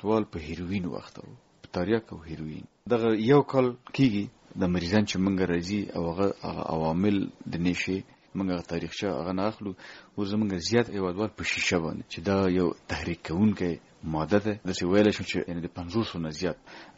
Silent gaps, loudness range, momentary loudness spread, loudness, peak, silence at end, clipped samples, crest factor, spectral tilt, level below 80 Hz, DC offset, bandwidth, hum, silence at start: none; 4 LU; 12 LU; -28 LUFS; -8 dBFS; 0.05 s; under 0.1%; 20 dB; -5.5 dB/octave; -54 dBFS; under 0.1%; 8 kHz; none; 0 s